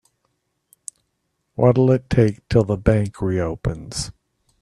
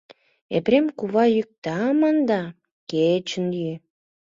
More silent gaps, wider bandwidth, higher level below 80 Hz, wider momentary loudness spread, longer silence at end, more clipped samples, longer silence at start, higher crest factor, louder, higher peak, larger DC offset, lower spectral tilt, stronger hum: second, none vs 1.58-1.62 s, 2.72-2.87 s; first, 12 kHz vs 7.6 kHz; first, -40 dBFS vs -66 dBFS; first, 21 LU vs 11 LU; about the same, 0.5 s vs 0.55 s; neither; first, 1.6 s vs 0.5 s; about the same, 20 dB vs 16 dB; about the same, -20 LUFS vs -22 LUFS; first, -2 dBFS vs -6 dBFS; neither; about the same, -7 dB/octave vs -6.5 dB/octave; neither